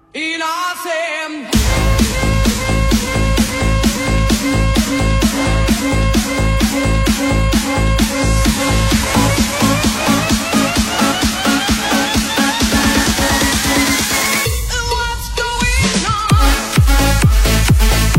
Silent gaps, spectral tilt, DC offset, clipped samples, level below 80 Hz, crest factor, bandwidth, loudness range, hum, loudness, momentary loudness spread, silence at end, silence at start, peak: none; -4 dB/octave; under 0.1%; under 0.1%; -18 dBFS; 14 dB; 16.5 kHz; 1 LU; none; -14 LUFS; 5 LU; 0 s; 0.15 s; 0 dBFS